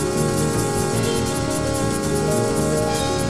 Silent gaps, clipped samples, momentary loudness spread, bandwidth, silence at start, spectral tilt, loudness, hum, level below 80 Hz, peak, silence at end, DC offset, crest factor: none; under 0.1%; 2 LU; 15 kHz; 0 s; -5 dB/octave; -21 LUFS; none; -36 dBFS; -6 dBFS; 0 s; 0.8%; 14 dB